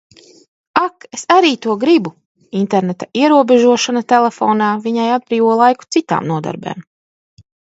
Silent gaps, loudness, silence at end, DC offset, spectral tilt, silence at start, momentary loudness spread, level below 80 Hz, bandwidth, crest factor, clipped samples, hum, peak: 2.25-2.35 s; -14 LUFS; 0.95 s; under 0.1%; -5 dB/octave; 0.75 s; 13 LU; -64 dBFS; 8 kHz; 14 dB; under 0.1%; none; 0 dBFS